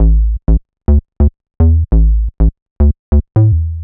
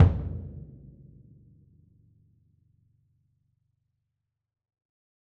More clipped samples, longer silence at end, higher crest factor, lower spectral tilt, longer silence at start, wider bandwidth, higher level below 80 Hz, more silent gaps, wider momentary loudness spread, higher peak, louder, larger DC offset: neither; second, 0 s vs 4.7 s; second, 10 dB vs 26 dB; first, -14.5 dB/octave vs -10 dB/octave; about the same, 0 s vs 0 s; second, 1.8 kHz vs 3.5 kHz; first, -12 dBFS vs -42 dBFS; first, 2.62-2.76 s, 2.99-3.12 s vs none; second, 5 LU vs 25 LU; first, 0 dBFS vs -6 dBFS; first, -14 LUFS vs -30 LUFS; neither